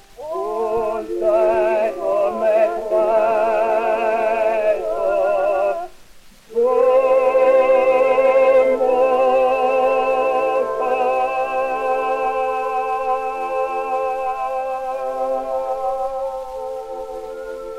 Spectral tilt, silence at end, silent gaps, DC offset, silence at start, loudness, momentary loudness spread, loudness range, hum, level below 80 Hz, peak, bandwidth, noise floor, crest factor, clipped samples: -4.5 dB/octave; 0 s; none; under 0.1%; 0.2 s; -18 LUFS; 11 LU; 8 LU; none; -50 dBFS; -6 dBFS; 12 kHz; -43 dBFS; 12 dB; under 0.1%